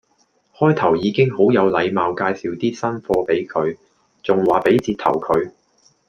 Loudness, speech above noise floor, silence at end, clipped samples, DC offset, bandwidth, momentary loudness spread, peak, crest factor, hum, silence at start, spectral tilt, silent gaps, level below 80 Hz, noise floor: -18 LUFS; 44 dB; 0.6 s; under 0.1%; under 0.1%; 9.2 kHz; 8 LU; -2 dBFS; 16 dB; none; 0.6 s; -7 dB/octave; none; -54 dBFS; -62 dBFS